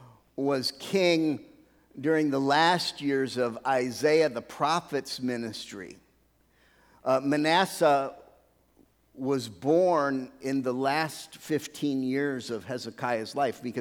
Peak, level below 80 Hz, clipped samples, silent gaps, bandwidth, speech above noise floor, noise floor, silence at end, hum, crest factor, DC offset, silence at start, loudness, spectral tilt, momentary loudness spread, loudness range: -8 dBFS; -70 dBFS; under 0.1%; none; 18.5 kHz; 38 dB; -66 dBFS; 0 s; none; 20 dB; under 0.1%; 0 s; -28 LUFS; -4.5 dB/octave; 12 LU; 4 LU